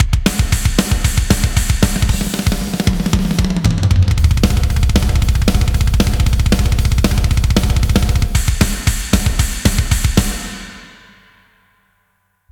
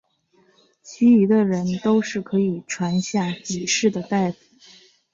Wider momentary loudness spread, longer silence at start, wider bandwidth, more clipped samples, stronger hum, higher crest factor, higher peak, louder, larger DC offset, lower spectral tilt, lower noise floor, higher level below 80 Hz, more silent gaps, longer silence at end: second, 3 LU vs 10 LU; second, 0 s vs 0.85 s; first, 19 kHz vs 7.8 kHz; neither; neither; about the same, 14 dB vs 14 dB; first, 0 dBFS vs -6 dBFS; first, -15 LUFS vs -21 LUFS; neither; about the same, -5 dB/octave vs -5 dB/octave; about the same, -63 dBFS vs -61 dBFS; first, -18 dBFS vs -62 dBFS; neither; first, 1.65 s vs 0.8 s